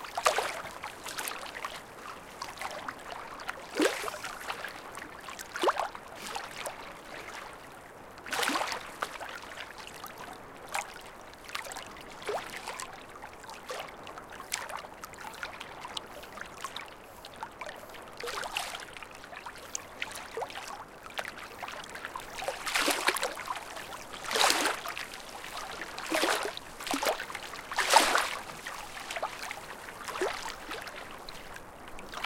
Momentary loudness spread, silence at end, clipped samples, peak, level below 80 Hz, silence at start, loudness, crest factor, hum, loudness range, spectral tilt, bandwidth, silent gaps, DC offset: 16 LU; 0 s; under 0.1%; -2 dBFS; -60 dBFS; 0 s; -35 LUFS; 34 dB; none; 10 LU; -1 dB/octave; 17 kHz; none; under 0.1%